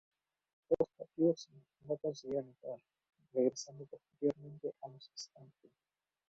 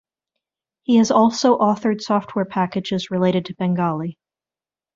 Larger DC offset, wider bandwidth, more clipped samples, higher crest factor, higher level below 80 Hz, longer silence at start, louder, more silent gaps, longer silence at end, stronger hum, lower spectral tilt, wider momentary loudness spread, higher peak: neither; about the same, 7.6 kHz vs 7.6 kHz; neither; about the same, 22 dB vs 18 dB; second, -78 dBFS vs -62 dBFS; second, 0.7 s vs 0.9 s; second, -39 LUFS vs -19 LUFS; neither; about the same, 0.85 s vs 0.85 s; neither; first, -7.5 dB/octave vs -6 dB/octave; first, 18 LU vs 9 LU; second, -18 dBFS vs -2 dBFS